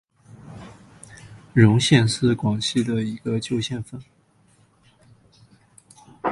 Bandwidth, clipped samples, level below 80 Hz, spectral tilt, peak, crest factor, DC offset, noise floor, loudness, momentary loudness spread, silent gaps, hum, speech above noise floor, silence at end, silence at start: 11.5 kHz; under 0.1%; -52 dBFS; -5.5 dB/octave; -2 dBFS; 22 dB; under 0.1%; -59 dBFS; -21 LUFS; 26 LU; none; none; 39 dB; 0 s; 0.45 s